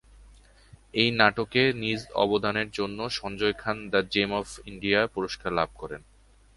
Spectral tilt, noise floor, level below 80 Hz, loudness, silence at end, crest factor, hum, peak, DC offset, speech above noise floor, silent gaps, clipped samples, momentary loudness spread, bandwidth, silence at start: -5 dB/octave; -54 dBFS; -52 dBFS; -26 LUFS; 0.6 s; 24 dB; none; -4 dBFS; under 0.1%; 27 dB; none; under 0.1%; 10 LU; 11.5 kHz; 0.2 s